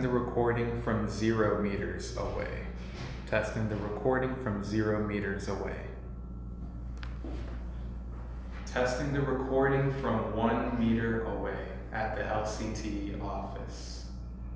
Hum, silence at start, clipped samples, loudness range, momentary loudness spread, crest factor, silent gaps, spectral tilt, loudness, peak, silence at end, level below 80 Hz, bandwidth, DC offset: none; 0 s; under 0.1%; 7 LU; 13 LU; 18 dB; none; -7 dB/octave; -33 LUFS; -14 dBFS; 0 s; -42 dBFS; 8 kHz; under 0.1%